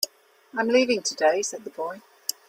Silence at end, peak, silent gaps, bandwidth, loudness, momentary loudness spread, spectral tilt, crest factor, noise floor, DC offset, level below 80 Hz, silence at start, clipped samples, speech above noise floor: 0.15 s; -4 dBFS; none; 16.5 kHz; -25 LUFS; 13 LU; -1.5 dB/octave; 22 dB; -48 dBFS; under 0.1%; -74 dBFS; 0 s; under 0.1%; 24 dB